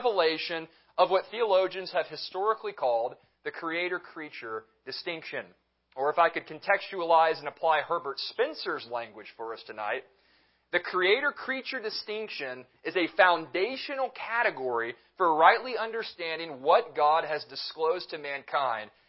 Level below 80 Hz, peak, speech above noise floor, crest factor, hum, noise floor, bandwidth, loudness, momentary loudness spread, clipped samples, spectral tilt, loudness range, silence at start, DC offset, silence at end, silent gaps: -80 dBFS; -6 dBFS; 38 dB; 24 dB; none; -67 dBFS; 5.8 kHz; -29 LUFS; 14 LU; under 0.1%; -7 dB/octave; 6 LU; 0 s; under 0.1%; 0.2 s; none